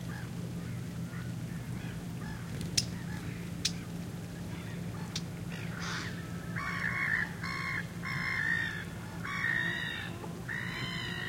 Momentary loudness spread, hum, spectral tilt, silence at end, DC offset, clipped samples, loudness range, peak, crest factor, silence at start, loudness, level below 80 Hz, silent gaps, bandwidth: 10 LU; none; -4 dB/octave; 0 s; under 0.1%; under 0.1%; 5 LU; -8 dBFS; 28 dB; 0 s; -36 LUFS; -56 dBFS; none; 16.5 kHz